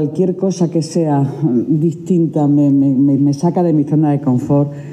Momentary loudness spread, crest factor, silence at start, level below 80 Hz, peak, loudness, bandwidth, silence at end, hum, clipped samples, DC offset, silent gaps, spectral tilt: 4 LU; 10 dB; 0 s; -58 dBFS; -4 dBFS; -14 LUFS; 9.4 kHz; 0 s; none; under 0.1%; under 0.1%; none; -9 dB/octave